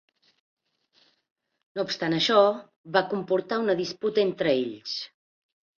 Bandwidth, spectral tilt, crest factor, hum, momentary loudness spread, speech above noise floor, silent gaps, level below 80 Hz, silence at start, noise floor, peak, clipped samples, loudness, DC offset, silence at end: 7.4 kHz; -5 dB/octave; 20 dB; none; 13 LU; 41 dB; 2.76-2.84 s; -72 dBFS; 1.75 s; -66 dBFS; -8 dBFS; under 0.1%; -25 LUFS; under 0.1%; 0.75 s